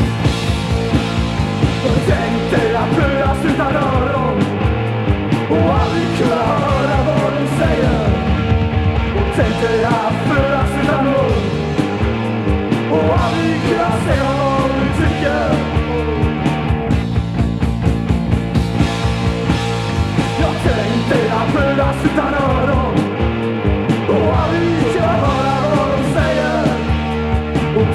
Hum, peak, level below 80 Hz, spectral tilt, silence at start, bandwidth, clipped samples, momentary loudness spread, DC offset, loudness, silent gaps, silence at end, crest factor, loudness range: none; 0 dBFS; -26 dBFS; -7 dB/octave; 0 s; 12.5 kHz; under 0.1%; 3 LU; under 0.1%; -16 LUFS; none; 0 s; 14 dB; 2 LU